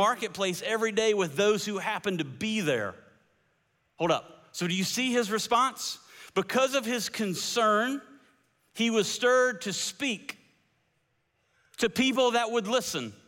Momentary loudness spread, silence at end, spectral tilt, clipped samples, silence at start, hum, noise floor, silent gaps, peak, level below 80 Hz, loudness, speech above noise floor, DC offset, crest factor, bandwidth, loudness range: 9 LU; 0.15 s; -3 dB/octave; under 0.1%; 0 s; none; -74 dBFS; none; -12 dBFS; -70 dBFS; -28 LUFS; 46 dB; under 0.1%; 16 dB; 17 kHz; 3 LU